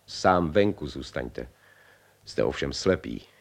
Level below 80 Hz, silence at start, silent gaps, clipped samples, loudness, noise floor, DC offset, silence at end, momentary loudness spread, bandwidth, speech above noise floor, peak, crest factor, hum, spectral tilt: -48 dBFS; 0.1 s; none; under 0.1%; -27 LUFS; -58 dBFS; under 0.1%; 0.15 s; 16 LU; 13.5 kHz; 31 dB; -8 dBFS; 20 dB; 50 Hz at -55 dBFS; -5.5 dB/octave